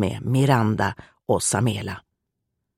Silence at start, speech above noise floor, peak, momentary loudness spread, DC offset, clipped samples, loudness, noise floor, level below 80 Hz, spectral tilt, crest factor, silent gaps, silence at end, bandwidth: 0 s; 57 dB; -4 dBFS; 15 LU; under 0.1%; under 0.1%; -22 LUFS; -79 dBFS; -52 dBFS; -5 dB/octave; 18 dB; none; 0.8 s; 15 kHz